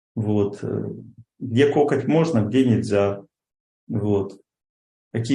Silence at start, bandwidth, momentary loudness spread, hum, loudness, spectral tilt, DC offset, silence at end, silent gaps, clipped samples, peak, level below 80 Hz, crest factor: 0.15 s; 10.5 kHz; 15 LU; none; -22 LUFS; -7.5 dB/octave; under 0.1%; 0 s; 3.60-3.87 s, 4.69-5.11 s; under 0.1%; -6 dBFS; -62 dBFS; 16 dB